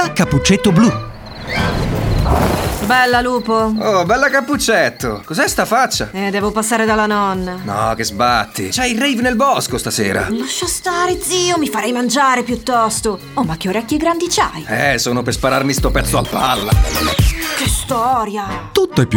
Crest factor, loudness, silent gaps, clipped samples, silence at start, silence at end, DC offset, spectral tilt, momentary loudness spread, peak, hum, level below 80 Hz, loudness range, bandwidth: 14 dB; -15 LUFS; none; under 0.1%; 0 s; 0 s; under 0.1%; -4 dB/octave; 6 LU; 0 dBFS; none; -28 dBFS; 2 LU; over 20 kHz